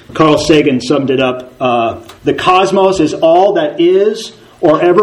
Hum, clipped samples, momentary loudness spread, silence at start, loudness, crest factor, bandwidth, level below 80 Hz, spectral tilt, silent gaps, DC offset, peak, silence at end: none; 0.3%; 8 LU; 0.1 s; -11 LUFS; 10 dB; 12 kHz; -44 dBFS; -5.5 dB/octave; none; under 0.1%; 0 dBFS; 0 s